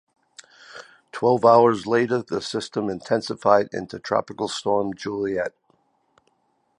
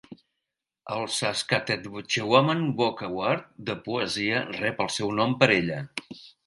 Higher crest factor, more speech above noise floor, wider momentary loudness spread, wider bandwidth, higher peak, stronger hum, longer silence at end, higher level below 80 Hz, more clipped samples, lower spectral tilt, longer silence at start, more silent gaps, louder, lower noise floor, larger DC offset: second, 20 dB vs 26 dB; second, 47 dB vs 59 dB; first, 16 LU vs 13 LU; about the same, 10.5 kHz vs 11.5 kHz; about the same, -2 dBFS vs -2 dBFS; neither; first, 1.3 s vs 0.15 s; about the same, -62 dBFS vs -62 dBFS; neither; about the same, -5.5 dB/octave vs -4.5 dB/octave; first, 0.75 s vs 0.1 s; neither; first, -22 LUFS vs -26 LUFS; second, -68 dBFS vs -85 dBFS; neither